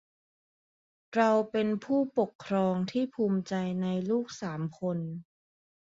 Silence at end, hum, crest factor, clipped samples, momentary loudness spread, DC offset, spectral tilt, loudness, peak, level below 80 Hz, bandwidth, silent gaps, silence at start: 0.75 s; none; 18 dB; under 0.1%; 10 LU; under 0.1%; -7 dB/octave; -30 LUFS; -12 dBFS; -72 dBFS; 7.8 kHz; 2.35-2.39 s; 1.1 s